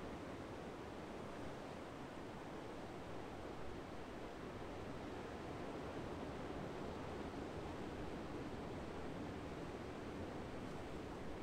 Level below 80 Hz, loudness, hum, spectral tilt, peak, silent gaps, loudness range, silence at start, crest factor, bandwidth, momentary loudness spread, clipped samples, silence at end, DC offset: -62 dBFS; -50 LUFS; none; -6 dB/octave; -36 dBFS; none; 2 LU; 0 s; 12 dB; 15.5 kHz; 3 LU; under 0.1%; 0 s; under 0.1%